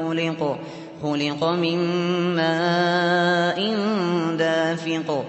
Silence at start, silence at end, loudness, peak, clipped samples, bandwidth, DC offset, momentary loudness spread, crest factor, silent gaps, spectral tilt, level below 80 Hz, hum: 0 s; 0 s; -22 LUFS; -8 dBFS; under 0.1%; 8.4 kHz; under 0.1%; 7 LU; 14 dB; none; -6 dB/octave; -68 dBFS; none